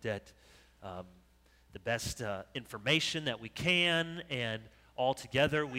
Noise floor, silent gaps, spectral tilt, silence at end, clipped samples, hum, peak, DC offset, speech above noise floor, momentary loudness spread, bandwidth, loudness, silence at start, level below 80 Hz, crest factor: -65 dBFS; none; -4 dB/octave; 0 s; under 0.1%; none; -14 dBFS; under 0.1%; 31 dB; 18 LU; 16 kHz; -33 LUFS; 0 s; -60 dBFS; 20 dB